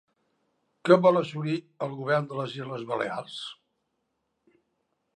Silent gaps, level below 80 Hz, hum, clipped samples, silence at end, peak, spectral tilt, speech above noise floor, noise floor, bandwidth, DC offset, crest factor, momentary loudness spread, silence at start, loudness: none; -82 dBFS; none; under 0.1%; 1.65 s; -4 dBFS; -7 dB/octave; 52 dB; -78 dBFS; 10.5 kHz; under 0.1%; 24 dB; 16 LU; 0.85 s; -27 LUFS